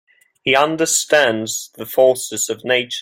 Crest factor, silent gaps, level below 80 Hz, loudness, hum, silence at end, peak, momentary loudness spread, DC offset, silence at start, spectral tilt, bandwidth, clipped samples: 16 dB; none; -62 dBFS; -17 LUFS; none; 0 s; -2 dBFS; 9 LU; under 0.1%; 0.45 s; -2 dB/octave; 16.5 kHz; under 0.1%